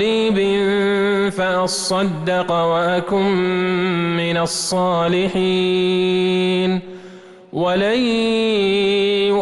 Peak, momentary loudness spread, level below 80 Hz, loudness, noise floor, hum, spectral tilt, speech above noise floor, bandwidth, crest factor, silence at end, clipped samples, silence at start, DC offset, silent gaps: -8 dBFS; 3 LU; -52 dBFS; -18 LUFS; -40 dBFS; none; -5 dB/octave; 22 dB; 12 kHz; 8 dB; 0 s; under 0.1%; 0 s; under 0.1%; none